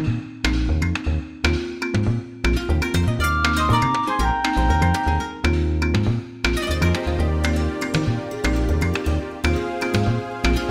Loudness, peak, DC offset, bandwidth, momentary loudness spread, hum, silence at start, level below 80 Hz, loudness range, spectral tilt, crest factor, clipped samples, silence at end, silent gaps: -22 LUFS; -4 dBFS; under 0.1%; 16 kHz; 5 LU; none; 0 s; -26 dBFS; 2 LU; -6 dB/octave; 16 dB; under 0.1%; 0 s; none